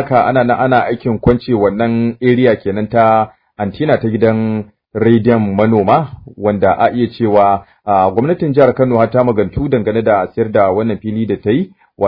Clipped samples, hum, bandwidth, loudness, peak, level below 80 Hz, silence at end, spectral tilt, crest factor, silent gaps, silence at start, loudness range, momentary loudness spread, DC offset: 0.1%; none; 5.2 kHz; -13 LUFS; 0 dBFS; -40 dBFS; 0 s; -11 dB/octave; 12 dB; none; 0 s; 1 LU; 7 LU; under 0.1%